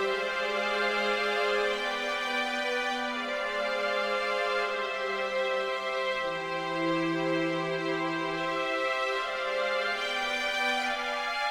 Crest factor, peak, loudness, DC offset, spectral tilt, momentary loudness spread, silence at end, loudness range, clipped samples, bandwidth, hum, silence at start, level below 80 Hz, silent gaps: 14 dB; -16 dBFS; -29 LUFS; under 0.1%; -3.5 dB/octave; 3 LU; 0 s; 1 LU; under 0.1%; 16 kHz; none; 0 s; -64 dBFS; none